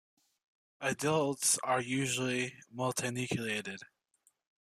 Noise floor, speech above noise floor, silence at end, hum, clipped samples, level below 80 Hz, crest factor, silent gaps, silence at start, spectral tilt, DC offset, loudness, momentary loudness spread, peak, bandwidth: -74 dBFS; 40 dB; 0.9 s; none; under 0.1%; -74 dBFS; 18 dB; none; 0.8 s; -3.5 dB/octave; under 0.1%; -33 LUFS; 9 LU; -16 dBFS; 15.5 kHz